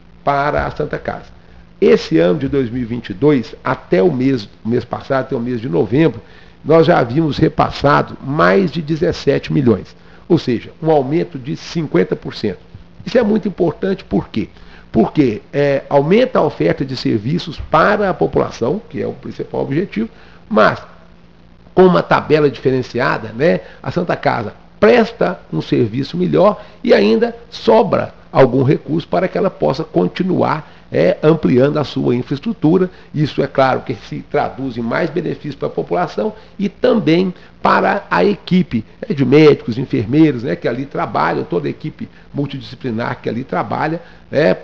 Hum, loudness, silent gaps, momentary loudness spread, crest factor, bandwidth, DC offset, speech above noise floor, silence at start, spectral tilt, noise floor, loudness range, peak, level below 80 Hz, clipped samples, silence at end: none; -16 LUFS; none; 11 LU; 14 dB; 7.2 kHz; 0.8%; 30 dB; 0.25 s; -8 dB/octave; -45 dBFS; 4 LU; 0 dBFS; -42 dBFS; under 0.1%; 0 s